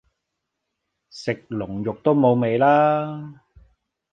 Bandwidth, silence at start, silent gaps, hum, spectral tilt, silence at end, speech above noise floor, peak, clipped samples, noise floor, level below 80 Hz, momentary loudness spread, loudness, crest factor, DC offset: 9 kHz; 1.15 s; none; none; -8 dB/octave; 0.8 s; 60 dB; -4 dBFS; under 0.1%; -80 dBFS; -58 dBFS; 15 LU; -20 LUFS; 18 dB; under 0.1%